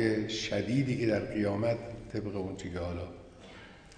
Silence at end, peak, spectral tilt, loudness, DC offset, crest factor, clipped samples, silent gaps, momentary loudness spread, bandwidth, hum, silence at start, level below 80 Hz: 0 s; -14 dBFS; -6 dB/octave; -33 LUFS; under 0.1%; 18 dB; under 0.1%; none; 20 LU; 10 kHz; none; 0 s; -54 dBFS